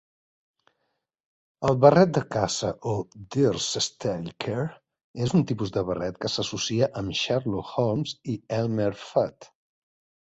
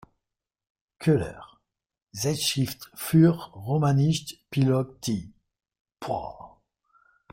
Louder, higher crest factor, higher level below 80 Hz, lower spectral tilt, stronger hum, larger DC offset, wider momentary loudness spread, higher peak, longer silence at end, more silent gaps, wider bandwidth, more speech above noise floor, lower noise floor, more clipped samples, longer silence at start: about the same, -26 LUFS vs -26 LUFS; about the same, 24 dB vs 20 dB; about the same, -56 dBFS vs -58 dBFS; about the same, -5.5 dB/octave vs -6 dB/octave; neither; neither; second, 11 LU vs 17 LU; first, -2 dBFS vs -8 dBFS; about the same, 0.8 s vs 0.85 s; about the same, 5.04-5.14 s vs 2.02-2.07 s, 5.81-5.85 s; second, 8.2 kHz vs 16.5 kHz; second, 53 dB vs 63 dB; second, -78 dBFS vs -87 dBFS; neither; first, 1.6 s vs 1 s